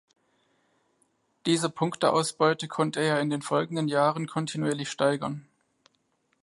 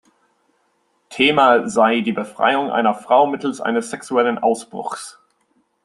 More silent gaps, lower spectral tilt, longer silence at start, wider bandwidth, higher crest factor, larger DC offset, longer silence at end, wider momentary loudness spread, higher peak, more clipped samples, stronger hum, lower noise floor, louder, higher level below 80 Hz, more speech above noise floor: neither; about the same, -5 dB/octave vs -4 dB/octave; first, 1.45 s vs 1.1 s; about the same, 11.5 kHz vs 12.5 kHz; about the same, 20 dB vs 18 dB; neither; first, 1 s vs 0.75 s; second, 7 LU vs 14 LU; second, -8 dBFS vs 0 dBFS; neither; neither; first, -72 dBFS vs -65 dBFS; second, -27 LUFS vs -18 LUFS; second, -74 dBFS vs -66 dBFS; about the same, 46 dB vs 47 dB